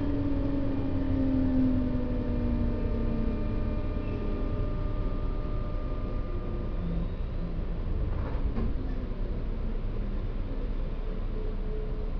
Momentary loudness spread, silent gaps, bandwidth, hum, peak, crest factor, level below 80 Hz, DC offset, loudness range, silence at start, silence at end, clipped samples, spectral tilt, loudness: 8 LU; none; 5.4 kHz; none; -16 dBFS; 14 dB; -30 dBFS; under 0.1%; 6 LU; 0 s; 0 s; under 0.1%; -10.5 dB/octave; -33 LUFS